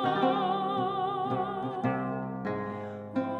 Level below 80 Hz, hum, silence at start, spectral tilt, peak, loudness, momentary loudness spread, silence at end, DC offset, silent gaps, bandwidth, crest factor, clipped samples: -66 dBFS; none; 0 s; -8 dB/octave; -14 dBFS; -31 LUFS; 8 LU; 0 s; under 0.1%; none; 9 kHz; 16 dB; under 0.1%